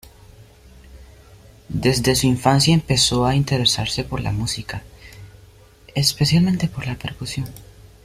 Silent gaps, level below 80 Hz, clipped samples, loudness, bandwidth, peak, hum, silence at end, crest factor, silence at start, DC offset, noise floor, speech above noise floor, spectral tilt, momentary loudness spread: none; -40 dBFS; under 0.1%; -19 LUFS; 15.5 kHz; -2 dBFS; none; 0.4 s; 20 dB; 0.4 s; under 0.1%; -48 dBFS; 29 dB; -4.5 dB/octave; 13 LU